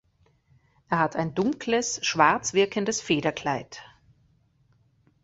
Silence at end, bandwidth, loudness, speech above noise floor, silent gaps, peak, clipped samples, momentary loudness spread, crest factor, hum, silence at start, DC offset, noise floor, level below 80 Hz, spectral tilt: 1.4 s; 8.2 kHz; -25 LUFS; 39 dB; none; -4 dBFS; under 0.1%; 9 LU; 24 dB; none; 0.9 s; under 0.1%; -65 dBFS; -62 dBFS; -3.5 dB/octave